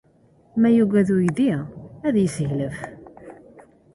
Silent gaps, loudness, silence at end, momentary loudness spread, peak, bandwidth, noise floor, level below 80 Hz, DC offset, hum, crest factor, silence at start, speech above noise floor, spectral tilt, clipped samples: none; -21 LUFS; 0.35 s; 15 LU; -8 dBFS; 11.5 kHz; -56 dBFS; -54 dBFS; under 0.1%; none; 16 dB; 0.55 s; 37 dB; -7.5 dB/octave; under 0.1%